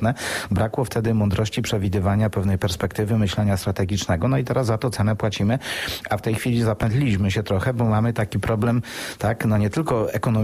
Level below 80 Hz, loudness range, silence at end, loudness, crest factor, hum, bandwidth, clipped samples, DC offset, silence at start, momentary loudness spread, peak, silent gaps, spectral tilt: -42 dBFS; 1 LU; 0 s; -22 LUFS; 12 dB; none; 15 kHz; under 0.1%; under 0.1%; 0 s; 4 LU; -8 dBFS; none; -6.5 dB/octave